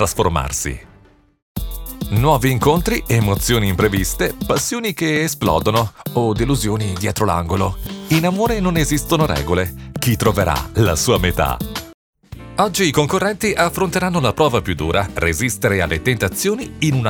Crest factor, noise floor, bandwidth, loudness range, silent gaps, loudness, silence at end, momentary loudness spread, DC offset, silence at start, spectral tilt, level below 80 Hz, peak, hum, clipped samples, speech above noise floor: 16 dB; -49 dBFS; over 20 kHz; 1 LU; 1.42-1.55 s, 11.94-12.13 s; -18 LUFS; 0 s; 7 LU; under 0.1%; 0 s; -5 dB/octave; -32 dBFS; -2 dBFS; none; under 0.1%; 32 dB